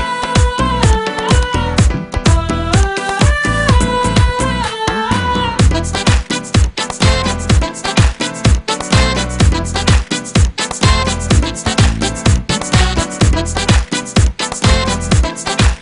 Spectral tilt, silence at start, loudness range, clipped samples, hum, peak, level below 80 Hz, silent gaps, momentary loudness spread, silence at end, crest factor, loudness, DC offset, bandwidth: -4.5 dB/octave; 0 s; 1 LU; under 0.1%; none; 0 dBFS; -18 dBFS; none; 3 LU; 0 s; 12 dB; -14 LUFS; under 0.1%; 11 kHz